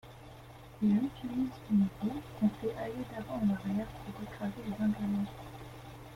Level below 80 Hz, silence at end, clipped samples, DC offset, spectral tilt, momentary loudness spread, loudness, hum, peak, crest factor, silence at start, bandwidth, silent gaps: -58 dBFS; 0 s; under 0.1%; under 0.1%; -8 dB/octave; 18 LU; -34 LUFS; none; -20 dBFS; 16 dB; 0.05 s; 15.5 kHz; none